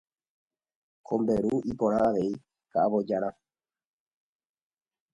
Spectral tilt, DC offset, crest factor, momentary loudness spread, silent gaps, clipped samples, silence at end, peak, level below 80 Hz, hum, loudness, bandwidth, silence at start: -8.5 dB/octave; under 0.1%; 18 dB; 8 LU; none; under 0.1%; 1.85 s; -12 dBFS; -60 dBFS; none; -28 LUFS; 10.5 kHz; 1.1 s